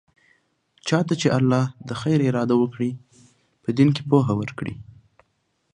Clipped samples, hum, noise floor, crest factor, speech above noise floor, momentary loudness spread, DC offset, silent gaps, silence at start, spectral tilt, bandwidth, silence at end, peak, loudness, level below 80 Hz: under 0.1%; none; -70 dBFS; 20 dB; 49 dB; 13 LU; under 0.1%; none; 0.85 s; -7 dB/octave; 10.5 kHz; 0.95 s; -4 dBFS; -22 LUFS; -58 dBFS